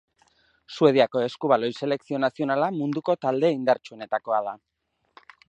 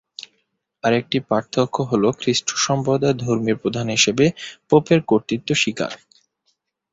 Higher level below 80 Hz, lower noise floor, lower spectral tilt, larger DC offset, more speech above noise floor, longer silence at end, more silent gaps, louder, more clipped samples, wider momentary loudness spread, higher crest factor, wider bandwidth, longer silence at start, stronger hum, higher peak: second, -76 dBFS vs -56 dBFS; second, -64 dBFS vs -70 dBFS; first, -6.5 dB/octave vs -4.5 dB/octave; neither; second, 40 dB vs 51 dB; about the same, 0.9 s vs 0.95 s; neither; second, -24 LUFS vs -19 LUFS; neither; about the same, 10 LU vs 10 LU; about the same, 20 dB vs 18 dB; about the same, 8.8 kHz vs 8 kHz; first, 0.7 s vs 0.2 s; neither; about the same, -4 dBFS vs -2 dBFS